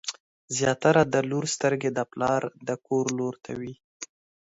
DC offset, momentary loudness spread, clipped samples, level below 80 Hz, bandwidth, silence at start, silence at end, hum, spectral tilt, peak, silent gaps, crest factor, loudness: under 0.1%; 19 LU; under 0.1%; -64 dBFS; 8 kHz; 0.05 s; 0.5 s; none; -4.5 dB/octave; -6 dBFS; 0.20-0.48 s, 3.84-4.00 s; 20 dB; -26 LUFS